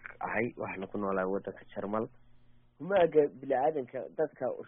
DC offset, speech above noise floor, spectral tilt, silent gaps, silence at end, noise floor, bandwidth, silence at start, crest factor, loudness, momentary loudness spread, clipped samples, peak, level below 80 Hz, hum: under 0.1%; 26 dB; -2 dB/octave; none; 0 s; -58 dBFS; 3.7 kHz; 0.05 s; 20 dB; -32 LUFS; 13 LU; under 0.1%; -14 dBFS; -64 dBFS; none